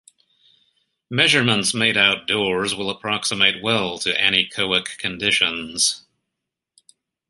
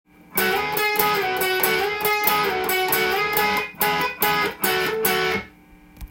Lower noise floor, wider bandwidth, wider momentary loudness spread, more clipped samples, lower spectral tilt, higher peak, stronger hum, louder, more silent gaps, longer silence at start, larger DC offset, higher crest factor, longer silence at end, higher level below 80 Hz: first, -82 dBFS vs -49 dBFS; second, 12 kHz vs 17.5 kHz; first, 8 LU vs 3 LU; neither; about the same, -2 dB/octave vs -2.5 dB/octave; first, 0 dBFS vs -4 dBFS; neither; about the same, -18 LUFS vs -20 LUFS; neither; first, 1.1 s vs 0.3 s; neither; about the same, 22 dB vs 20 dB; first, 1.3 s vs 0.05 s; second, -58 dBFS vs -50 dBFS